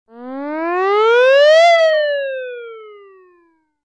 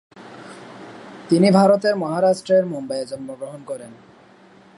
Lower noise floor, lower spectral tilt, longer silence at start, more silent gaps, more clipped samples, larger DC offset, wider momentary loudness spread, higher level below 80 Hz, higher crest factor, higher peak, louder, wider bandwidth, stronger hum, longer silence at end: first, -57 dBFS vs -49 dBFS; second, -0.5 dB/octave vs -6.5 dB/octave; about the same, 0.15 s vs 0.15 s; neither; neither; neither; second, 21 LU vs 24 LU; second, -78 dBFS vs -68 dBFS; second, 12 dB vs 20 dB; about the same, -4 dBFS vs -2 dBFS; first, -12 LUFS vs -18 LUFS; second, 9.4 kHz vs 11.5 kHz; neither; about the same, 0.9 s vs 0.85 s